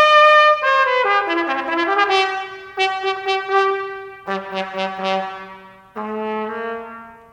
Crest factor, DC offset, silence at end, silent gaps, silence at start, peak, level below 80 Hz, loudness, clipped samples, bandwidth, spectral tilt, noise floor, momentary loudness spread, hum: 18 dB; under 0.1%; 0.15 s; none; 0 s; -2 dBFS; -64 dBFS; -17 LUFS; under 0.1%; 10.5 kHz; -3.5 dB/octave; -41 dBFS; 19 LU; none